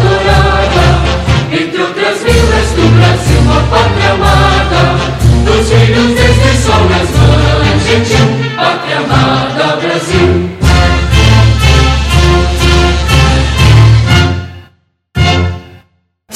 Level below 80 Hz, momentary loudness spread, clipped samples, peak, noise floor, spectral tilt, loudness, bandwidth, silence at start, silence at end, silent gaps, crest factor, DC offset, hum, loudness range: -14 dBFS; 5 LU; 0.9%; 0 dBFS; -51 dBFS; -5.5 dB/octave; -8 LUFS; 14 kHz; 0 s; 0 s; none; 8 dB; under 0.1%; none; 2 LU